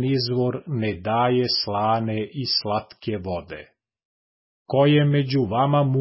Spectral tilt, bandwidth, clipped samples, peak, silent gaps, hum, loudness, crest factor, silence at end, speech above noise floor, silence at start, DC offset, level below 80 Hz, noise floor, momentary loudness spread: -9.5 dB/octave; 5.8 kHz; under 0.1%; -8 dBFS; 4.05-4.66 s; none; -22 LUFS; 14 dB; 0 s; over 68 dB; 0 s; under 0.1%; -52 dBFS; under -90 dBFS; 12 LU